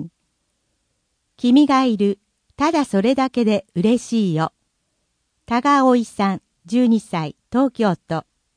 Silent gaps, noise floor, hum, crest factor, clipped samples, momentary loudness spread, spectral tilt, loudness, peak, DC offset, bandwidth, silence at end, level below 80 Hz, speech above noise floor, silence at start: none; -71 dBFS; none; 16 dB; under 0.1%; 11 LU; -6.5 dB/octave; -19 LUFS; -4 dBFS; under 0.1%; 10.5 kHz; 0.35 s; -58 dBFS; 53 dB; 0 s